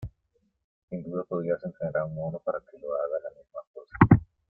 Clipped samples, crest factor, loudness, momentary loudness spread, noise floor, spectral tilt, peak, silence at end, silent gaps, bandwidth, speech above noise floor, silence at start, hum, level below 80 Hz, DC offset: under 0.1%; 26 dB; -28 LUFS; 23 LU; -73 dBFS; -12 dB/octave; -2 dBFS; 0.25 s; 0.64-0.88 s, 3.67-3.74 s; 4.3 kHz; 41 dB; 0 s; none; -50 dBFS; under 0.1%